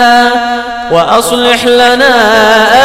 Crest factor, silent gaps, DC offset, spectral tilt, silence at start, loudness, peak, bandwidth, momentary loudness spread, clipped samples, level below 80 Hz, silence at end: 6 dB; none; under 0.1%; -2.5 dB/octave; 0 s; -7 LUFS; 0 dBFS; 17 kHz; 7 LU; 1%; -38 dBFS; 0 s